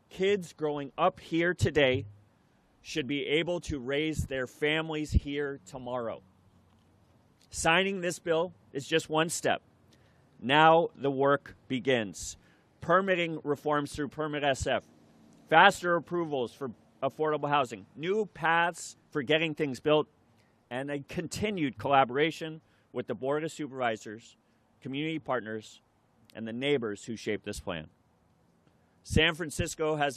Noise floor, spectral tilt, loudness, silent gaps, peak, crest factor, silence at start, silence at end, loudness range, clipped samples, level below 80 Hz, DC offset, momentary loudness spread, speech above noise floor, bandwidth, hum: -67 dBFS; -4.5 dB/octave; -30 LUFS; none; -6 dBFS; 26 dB; 0.15 s; 0 s; 8 LU; under 0.1%; -50 dBFS; under 0.1%; 15 LU; 37 dB; 14 kHz; none